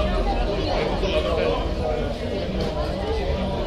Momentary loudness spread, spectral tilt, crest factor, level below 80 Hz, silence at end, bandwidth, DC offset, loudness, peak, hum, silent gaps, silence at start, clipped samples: 4 LU; -6.5 dB/octave; 14 dB; -28 dBFS; 0 s; 11 kHz; under 0.1%; -25 LUFS; -8 dBFS; none; none; 0 s; under 0.1%